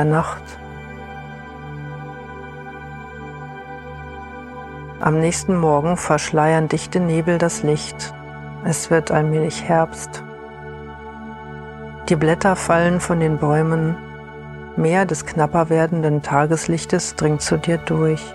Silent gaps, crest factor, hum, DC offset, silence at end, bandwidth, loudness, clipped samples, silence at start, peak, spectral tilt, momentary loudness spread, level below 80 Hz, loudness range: none; 18 dB; none; under 0.1%; 0 s; 12.5 kHz; -19 LUFS; under 0.1%; 0 s; -2 dBFS; -6 dB/octave; 17 LU; -44 dBFS; 15 LU